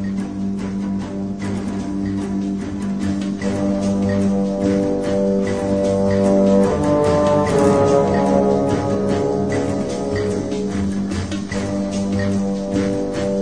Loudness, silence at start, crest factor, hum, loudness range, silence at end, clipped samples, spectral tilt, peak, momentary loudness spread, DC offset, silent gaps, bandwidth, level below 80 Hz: -19 LUFS; 0 s; 14 dB; none; 6 LU; 0 s; under 0.1%; -7 dB/octave; -4 dBFS; 9 LU; 0.7%; none; 10.5 kHz; -40 dBFS